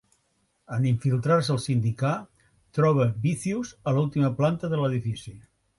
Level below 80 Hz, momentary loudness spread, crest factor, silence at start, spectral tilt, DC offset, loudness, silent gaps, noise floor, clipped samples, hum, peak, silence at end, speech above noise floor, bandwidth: -58 dBFS; 11 LU; 16 dB; 0.7 s; -7 dB/octave; under 0.1%; -26 LUFS; none; -71 dBFS; under 0.1%; none; -10 dBFS; 0.4 s; 46 dB; 11.5 kHz